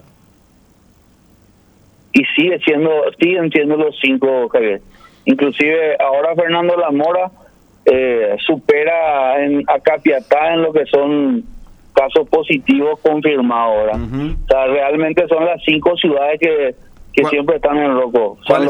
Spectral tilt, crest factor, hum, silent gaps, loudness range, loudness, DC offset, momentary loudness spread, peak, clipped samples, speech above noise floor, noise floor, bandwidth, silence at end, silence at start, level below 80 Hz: -6.5 dB/octave; 14 dB; none; none; 1 LU; -14 LUFS; under 0.1%; 4 LU; 0 dBFS; under 0.1%; 36 dB; -50 dBFS; 8.4 kHz; 0 s; 2.15 s; -38 dBFS